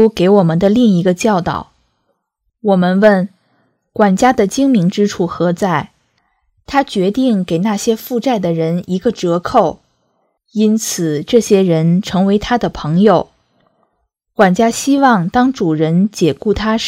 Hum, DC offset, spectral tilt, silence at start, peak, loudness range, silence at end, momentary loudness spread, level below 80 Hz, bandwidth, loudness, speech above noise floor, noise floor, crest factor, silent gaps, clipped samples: none; under 0.1%; -6 dB/octave; 0 s; 0 dBFS; 3 LU; 0 s; 7 LU; -42 dBFS; 16 kHz; -13 LUFS; 57 dB; -69 dBFS; 14 dB; none; 0.2%